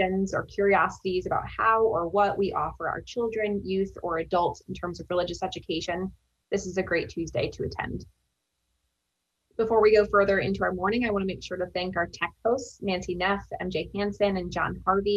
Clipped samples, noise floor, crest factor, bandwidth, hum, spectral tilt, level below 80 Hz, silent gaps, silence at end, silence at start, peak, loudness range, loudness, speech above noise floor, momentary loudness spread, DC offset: under 0.1%; -80 dBFS; 18 dB; 8 kHz; none; -5.5 dB/octave; -50 dBFS; none; 0 s; 0 s; -8 dBFS; 6 LU; -27 LUFS; 53 dB; 10 LU; under 0.1%